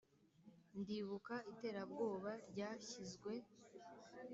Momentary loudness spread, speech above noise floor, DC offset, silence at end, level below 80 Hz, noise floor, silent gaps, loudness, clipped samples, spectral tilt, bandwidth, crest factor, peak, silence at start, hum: 17 LU; 21 dB; under 0.1%; 0 s; -86 dBFS; -69 dBFS; none; -49 LUFS; under 0.1%; -5 dB/octave; 8 kHz; 18 dB; -32 dBFS; 0.2 s; none